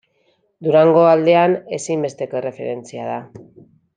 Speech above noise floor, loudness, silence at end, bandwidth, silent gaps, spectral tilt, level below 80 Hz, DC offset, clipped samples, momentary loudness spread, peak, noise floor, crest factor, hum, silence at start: 46 dB; -17 LUFS; 0.55 s; 9.4 kHz; none; -6 dB/octave; -68 dBFS; under 0.1%; under 0.1%; 16 LU; -2 dBFS; -63 dBFS; 16 dB; none; 0.6 s